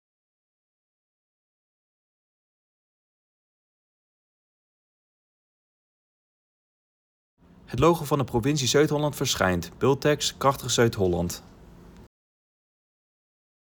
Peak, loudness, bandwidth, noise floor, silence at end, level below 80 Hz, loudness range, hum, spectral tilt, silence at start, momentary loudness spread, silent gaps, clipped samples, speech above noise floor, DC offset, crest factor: -8 dBFS; -24 LUFS; over 20 kHz; -49 dBFS; 1.6 s; -54 dBFS; 6 LU; none; -4.5 dB/octave; 7.7 s; 5 LU; none; under 0.1%; 25 dB; under 0.1%; 22 dB